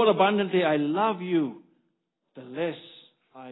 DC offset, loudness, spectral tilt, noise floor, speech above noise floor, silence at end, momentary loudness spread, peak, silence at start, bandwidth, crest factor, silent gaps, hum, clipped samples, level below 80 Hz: under 0.1%; -25 LUFS; -10 dB/octave; -76 dBFS; 52 dB; 0 s; 17 LU; -8 dBFS; 0 s; 4.1 kHz; 18 dB; none; none; under 0.1%; -78 dBFS